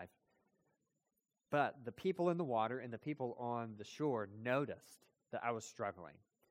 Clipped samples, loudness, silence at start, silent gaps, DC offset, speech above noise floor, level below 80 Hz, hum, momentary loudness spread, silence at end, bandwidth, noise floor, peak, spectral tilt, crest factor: under 0.1%; -41 LUFS; 0 s; none; under 0.1%; 48 dB; -84 dBFS; none; 11 LU; 0.4 s; 16 kHz; -89 dBFS; -22 dBFS; -6.5 dB/octave; 20 dB